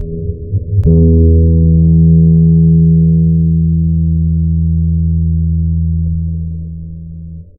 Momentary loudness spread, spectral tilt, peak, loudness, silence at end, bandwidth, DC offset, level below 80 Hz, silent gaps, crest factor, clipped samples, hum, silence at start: 14 LU; -16 dB/octave; 0 dBFS; -11 LUFS; 0.15 s; 0.8 kHz; under 0.1%; -18 dBFS; none; 10 dB; under 0.1%; none; 0 s